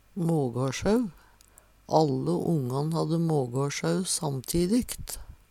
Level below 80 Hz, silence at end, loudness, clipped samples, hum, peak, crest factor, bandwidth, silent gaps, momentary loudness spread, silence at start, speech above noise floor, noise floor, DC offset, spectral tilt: -50 dBFS; 0.15 s; -28 LUFS; under 0.1%; none; -8 dBFS; 20 dB; 16 kHz; none; 6 LU; 0.15 s; 31 dB; -57 dBFS; under 0.1%; -5.5 dB/octave